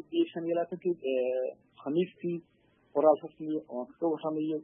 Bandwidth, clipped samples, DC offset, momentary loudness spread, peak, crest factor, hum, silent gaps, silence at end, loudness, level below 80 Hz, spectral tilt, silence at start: 3.7 kHz; under 0.1%; under 0.1%; 11 LU; -12 dBFS; 20 dB; none; none; 0 s; -32 LUFS; -82 dBFS; -10.5 dB/octave; 0.1 s